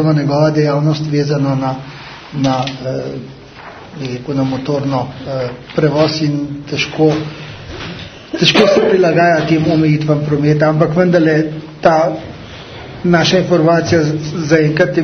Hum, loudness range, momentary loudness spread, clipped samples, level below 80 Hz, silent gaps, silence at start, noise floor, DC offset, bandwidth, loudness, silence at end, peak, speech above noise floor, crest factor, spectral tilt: none; 8 LU; 18 LU; under 0.1%; -46 dBFS; none; 0 s; -34 dBFS; under 0.1%; 6.6 kHz; -14 LUFS; 0 s; 0 dBFS; 21 dB; 14 dB; -6.5 dB/octave